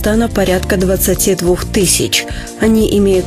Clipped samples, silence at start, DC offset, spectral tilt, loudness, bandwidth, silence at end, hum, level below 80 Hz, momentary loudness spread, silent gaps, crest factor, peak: under 0.1%; 0 s; under 0.1%; -4 dB/octave; -13 LUFS; 14.5 kHz; 0 s; none; -24 dBFS; 3 LU; none; 12 dB; 0 dBFS